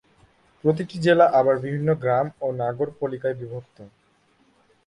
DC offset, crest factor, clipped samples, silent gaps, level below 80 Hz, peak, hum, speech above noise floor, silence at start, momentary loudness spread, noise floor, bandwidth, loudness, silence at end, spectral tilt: under 0.1%; 20 dB; under 0.1%; none; -62 dBFS; -4 dBFS; none; 40 dB; 0.65 s; 12 LU; -62 dBFS; 10.5 kHz; -22 LUFS; 1 s; -7.5 dB/octave